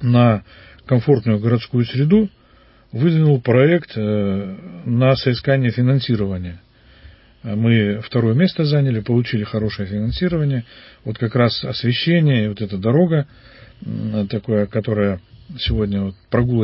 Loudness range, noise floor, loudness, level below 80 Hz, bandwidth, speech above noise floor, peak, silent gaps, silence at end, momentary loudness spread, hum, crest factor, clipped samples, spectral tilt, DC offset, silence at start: 3 LU; -50 dBFS; -18 LUFS; -40 dBFS; 5.8 kHz; 33 dB; -2 dBFS; none; 0 s; 11 LU; none; 16 dB; under 0.1%; -12 dB/octave; under 0.1%; 0 s